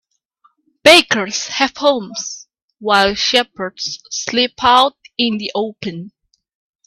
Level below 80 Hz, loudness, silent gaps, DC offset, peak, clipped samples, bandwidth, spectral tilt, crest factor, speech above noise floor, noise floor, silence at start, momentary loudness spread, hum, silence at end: -52 dBFS; -15 LUFS; 2.62-2.68 s; under 0.1%; 0 dBFS; under 0.1%; 16 kHz; -2 dB/octave; 18 dB; 42 dB; -58 dBFS; 0.85 s; 17 LU; none; 0.8 s